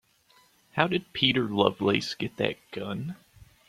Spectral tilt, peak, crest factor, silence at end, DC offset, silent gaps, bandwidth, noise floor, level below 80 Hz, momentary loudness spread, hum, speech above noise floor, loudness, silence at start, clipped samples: -5.5 dB/octave; -4 dBFS; 26 dB; 0.5 s; under 0.1%; none; 15.5 kHz; -62 dBFS; -64 dBFS; 12 LU; none; 35 dB; -27 LUFS; 0.75 s; under 0.1%